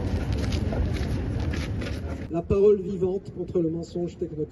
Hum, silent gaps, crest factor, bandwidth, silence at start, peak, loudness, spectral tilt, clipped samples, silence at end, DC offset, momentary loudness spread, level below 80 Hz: none; none; 16 dB; 12 kHz; 0 s; -10 dBFS; -27 LUFS; -8 dB/octave; under 0.1%; 0 s; under 0.1%; 11 LU; -34 dBFS